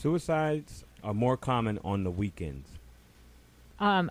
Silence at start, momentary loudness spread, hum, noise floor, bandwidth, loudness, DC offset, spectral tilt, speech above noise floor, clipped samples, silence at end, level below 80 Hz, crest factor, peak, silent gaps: 0 s; 14 LU; none; -56 dBFS; 15.5 kHz; -31 LUFS; under 0.1%; -7 dB/octave; 27 dB; under 0.1%; 0 s; -52 dBFS; 16 dB; -14 dBFS; none